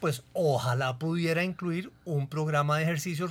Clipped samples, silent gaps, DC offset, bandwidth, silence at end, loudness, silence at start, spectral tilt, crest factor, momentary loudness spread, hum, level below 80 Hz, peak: under 0.1%; none; under 0.1%; 16.5 kHz; 0 s; -29 LUFS; 0 s; -6 dB/octave; 16 dB; 7 LU; none; -66 dBFS; -14 dBFS